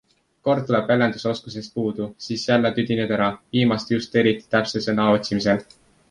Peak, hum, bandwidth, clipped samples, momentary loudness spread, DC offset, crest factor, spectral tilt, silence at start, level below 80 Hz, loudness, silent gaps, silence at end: -4 dBFS; none; 10.5 kHz; under 0.1%; 8 LU; under 0.1%; 18 dB; -6 dB/octave; 0.45 s; -56 dBFS; -22 LUFS; none; 0.45 s